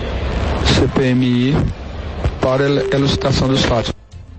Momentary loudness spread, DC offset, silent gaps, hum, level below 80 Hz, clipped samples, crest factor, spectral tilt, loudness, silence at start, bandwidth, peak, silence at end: 9 LU; under 0.1%; none; none; -26 dBFS; under 0.1%; 14 dB; -6 dB/octave; -16 LUFS; 0 s; 8.6 kHz; -2 dBFS; 0 s